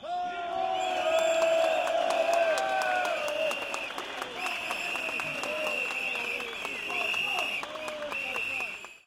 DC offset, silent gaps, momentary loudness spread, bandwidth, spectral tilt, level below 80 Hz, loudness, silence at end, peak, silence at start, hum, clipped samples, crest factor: under 0.1%; none; 8 LU; 16.5 kHz; -1.5 dB/octave; -68 dBFS; -29 LUFS; 0.05 s; -12 dBFS; 0 s; none; under 0.1%; 18 dB